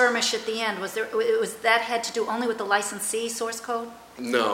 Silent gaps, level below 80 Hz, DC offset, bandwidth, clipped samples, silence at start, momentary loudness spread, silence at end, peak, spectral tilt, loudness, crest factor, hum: none; -68 dBFS; under 0.1%; 16.5 kHz; under 0.1%; 0 s; 8 LU; 0 s; -6 dBFS; -1.5 dB/octave; -25 LUFS; 20 dB; none